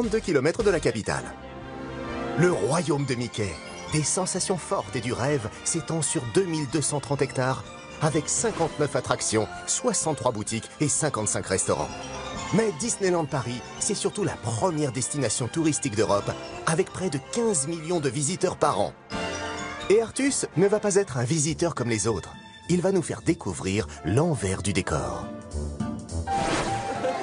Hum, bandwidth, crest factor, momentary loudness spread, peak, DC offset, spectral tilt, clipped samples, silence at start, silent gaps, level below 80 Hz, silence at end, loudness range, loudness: none; 10.5 kHz; 22 dB; 9 LU; -4 dBFS; under 0.1%; -4.5 dB/octave; under 0.1%; 0 s; none; -48 dBFS; 0 s; 2 LU; -26 LUFS